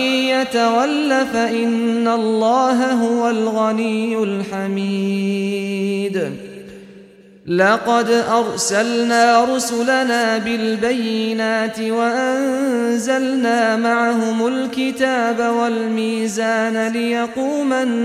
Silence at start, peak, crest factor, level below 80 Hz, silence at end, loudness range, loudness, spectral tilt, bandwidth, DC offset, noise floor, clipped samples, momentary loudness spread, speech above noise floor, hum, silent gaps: 0 s; -2 dBFS; 16 dB; -62 dBFS; 0 s; 4 LU; -17 LUFS; -4 dB/octave; 14.5 kHz; under 0.1%; -44 dBFS; under 0.1%; 6 LU; 26 dB; none; none